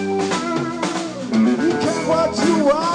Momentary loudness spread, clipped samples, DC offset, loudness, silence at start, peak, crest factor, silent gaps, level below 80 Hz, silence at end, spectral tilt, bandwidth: 6 LU; under 0.1%; under 0.1%; -19 LUFS; 0 s; -6 dBFS; 12 dB; none; -52 dBFS; 0 s; -5 dB/octave; 10 kHz